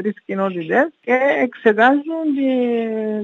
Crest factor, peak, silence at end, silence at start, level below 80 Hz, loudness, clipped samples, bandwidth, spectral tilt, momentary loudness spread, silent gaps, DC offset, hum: 18 dB; 0 dBFS; 0 s; 0 s; -78 dBFS; -18 LUFS; under 0.1%; 6.8 kHz; -7.5 dB/octave; 8 LU; none; under 0.1%; none